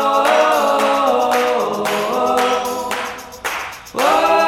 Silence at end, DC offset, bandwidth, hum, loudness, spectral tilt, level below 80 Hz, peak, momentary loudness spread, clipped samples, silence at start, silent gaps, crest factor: 0 s; under 0.1%; 17.5 kHz; none; -17 LUFS; -2.5 dB/octave; -54 dBFS; -2 dBFS; 11 LU; under 0.1%; 0 s; none; 14 dB